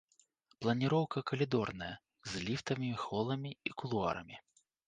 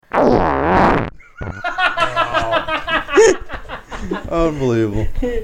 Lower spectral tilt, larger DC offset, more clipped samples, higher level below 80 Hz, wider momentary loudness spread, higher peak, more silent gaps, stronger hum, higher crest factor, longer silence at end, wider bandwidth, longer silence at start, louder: about the same, -6 dB/octave vs -5 dB/octave; neither; neither; second, -66 dBFS vs -30 dBFS; second, 12 LU vs 17 LU; second, -20 dBFS vs -2 dBFS; neither; neither; about the same, 18 dB vs 16 dB; first, 0.45 s vs 0 s; second, 9.6 kHz vs 11.5 kHz; first, 0.6 s vs 0.15 s; second, -37 LUFS vs -16 LUFS